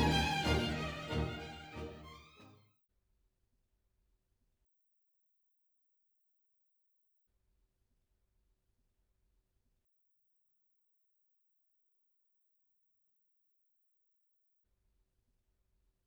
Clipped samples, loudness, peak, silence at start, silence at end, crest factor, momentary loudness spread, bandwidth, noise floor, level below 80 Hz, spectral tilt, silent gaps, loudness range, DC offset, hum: under 0.1%; -37 LUFS; -20 dBFS; 0 s; 13.55 s; 24 dB; 21 LU; over 20 kHz; -80 dBFS; -54 dBFS; -5 dB/octave; none; 19 LU; under 0.1%; none